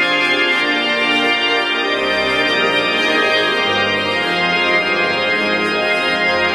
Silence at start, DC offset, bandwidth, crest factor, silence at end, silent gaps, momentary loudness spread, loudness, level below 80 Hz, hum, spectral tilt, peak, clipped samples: 0 s; under 0.1%; 14 kHz; 12 dB; 0 s; none; 2 LU; -14 LUFS; -52 dBFS; none; -3 dB/octave; -4 dBFS; under 0.1%